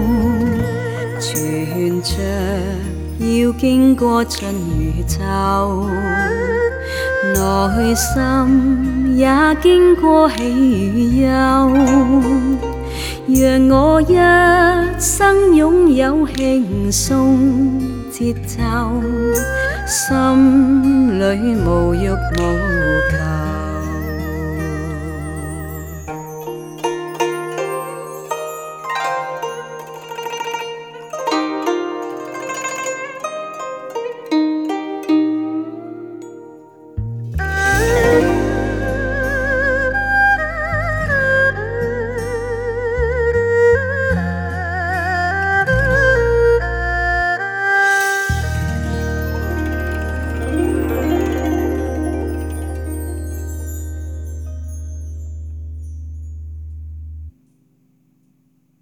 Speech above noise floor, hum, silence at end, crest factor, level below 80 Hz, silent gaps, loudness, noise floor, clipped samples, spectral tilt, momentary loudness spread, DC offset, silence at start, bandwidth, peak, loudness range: 46 dB; none; 1.5 s; 16 dB; -28 dBFS; none; -16 LUFS; -59 dBFS; under 0.1%; -5.5 dB/octave; 16 LU; under 0.1%; 0 s; 18 kHz; 0 dBFS; 12 LU